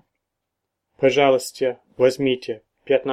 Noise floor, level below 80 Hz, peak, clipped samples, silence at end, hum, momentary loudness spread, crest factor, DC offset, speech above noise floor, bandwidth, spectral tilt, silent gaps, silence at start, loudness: -80 dBFS; -64 dBFS; -2 dBFS; under 0.1%; 0 s; none; 10 LU; 20 dB; under 0.1%; 61 dB; 16 kHz; -4.5 dB/octave; none; 1 s; -20 LUFS